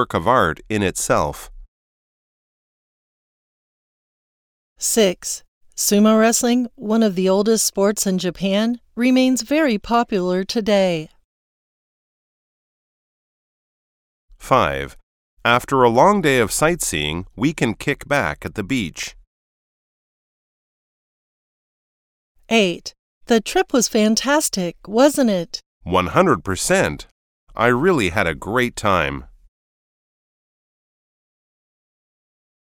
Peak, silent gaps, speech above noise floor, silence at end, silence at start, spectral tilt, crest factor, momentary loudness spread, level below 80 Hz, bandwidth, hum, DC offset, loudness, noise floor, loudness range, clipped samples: 0 dBFS; 1.68-4.76 s, 5.48-5.61 s, 11.24-14.28 s, 15.03-15.37 s, 19.27-22.35 s, 22.99-23.21 s, 25.66-25.81 s, 27.11-27.47 s; over 72 dB; 3.4 s; 0 s; -4 dB/octave; 20 dB; 11 LU; -46 dBFS; 19 kHz; none; under 0.1%; -18 LUFS; under -90 dBFS; 9 LU; under 0.1%